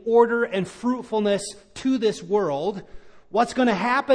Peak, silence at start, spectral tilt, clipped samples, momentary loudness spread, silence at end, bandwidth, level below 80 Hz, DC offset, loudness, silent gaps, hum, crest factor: -4 dBFS; 0.05 s; -5 dB/octave; under 0.1%; 9 LU; 0 s; 10.5 kHz; -56 dBFS; under 0.1%; -23 LUFS; none; none; 18 dB